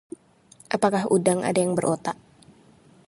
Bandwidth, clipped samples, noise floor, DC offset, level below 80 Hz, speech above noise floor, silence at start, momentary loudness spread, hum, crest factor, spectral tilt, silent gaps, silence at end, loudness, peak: 11.5 kHz; under 0.1%; -55 dBFS; under 0.1%; -66 dBFS; 32 dB; 0.7 s; 19 LU; none; 20 dB; -5.5 dB/octave; none; 0.95 s; -23 LUFS; -6 dBFS